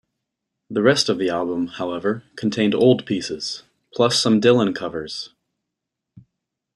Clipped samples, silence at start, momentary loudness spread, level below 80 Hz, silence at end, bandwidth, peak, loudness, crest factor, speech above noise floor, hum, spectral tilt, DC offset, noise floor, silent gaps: under 0.1%; 0.7 s; 13 LU; -62 dBFS; 0.55 s; 12 kHz; -2 dBFS; -20 LUFS; 20 dB; 63 dB; none; -4.5 dB/octave; under 0.1%; -82 dBFS; none